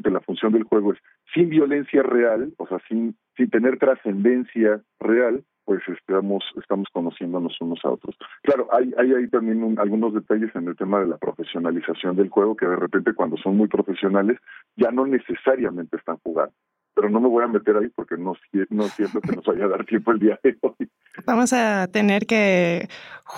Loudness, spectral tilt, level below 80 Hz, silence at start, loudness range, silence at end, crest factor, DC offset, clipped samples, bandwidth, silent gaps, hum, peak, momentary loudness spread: -22 LUFS; -6 dB/octave; -68 dBFS; 0.05 s; 3 LU; 0 s; 14 dB; under 0.1%; under 0.1%; 12 kHz; none; none; -6 dBFS; 9 LU